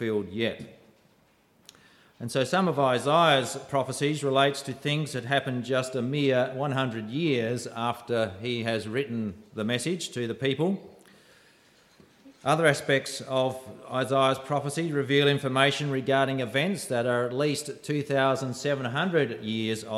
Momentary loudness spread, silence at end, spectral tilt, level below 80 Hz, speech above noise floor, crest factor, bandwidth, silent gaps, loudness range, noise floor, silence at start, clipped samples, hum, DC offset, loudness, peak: 9 LU; 0 s; -5 dB/octave; -70 dBFS; 37 dB; 20 dB; 15 kHz; none; 5 LU; -63 dBFS; 0 s; under 0.1%; none; under 0.1%; -27 LUFS; -6 dBFS